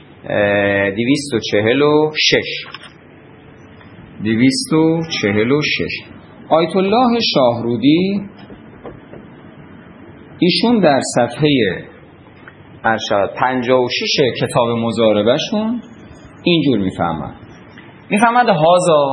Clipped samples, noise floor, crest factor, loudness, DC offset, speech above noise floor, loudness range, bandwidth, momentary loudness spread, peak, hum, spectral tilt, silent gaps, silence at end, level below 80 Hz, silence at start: under 0.1%; -41 dBFS; 16 dB; -15 LUFS; under 0.1%; 27 dB; 3 LU; 11.5 kHz; 12 LU; 0 dBFS; none; -5 dB/octave; none; 0 s; -52 dBFS; 0.25 s